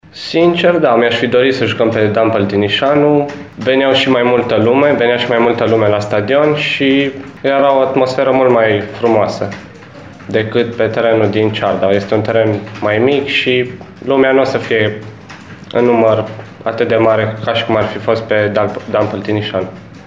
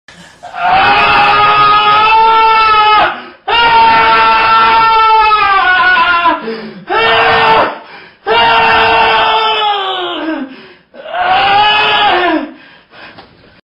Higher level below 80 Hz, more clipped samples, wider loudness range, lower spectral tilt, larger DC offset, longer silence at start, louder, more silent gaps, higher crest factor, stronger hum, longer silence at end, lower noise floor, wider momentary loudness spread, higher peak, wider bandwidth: second, -50 dBFS vs -38 dBFS; neither; about the same, 3 LU vs 4 LU; first, -6.5 dB/octave vs -4.5 dB/octave; first, 0.2% vs under 0.1%; second, 0.15 s vs 0.45 s; second, -13 LUFS vs -8 LUFS; neither; about the same, 12 dB vs 10 dB; neither; second, 0.05 s vs 0.45 s; second, -34 dBFS vs -38 dBFS; about the same, 9 LU vs 11 LU; about the same, 0 dBFS vs 0 dBFS; second, 7.8 kHz vs 8.8 kHz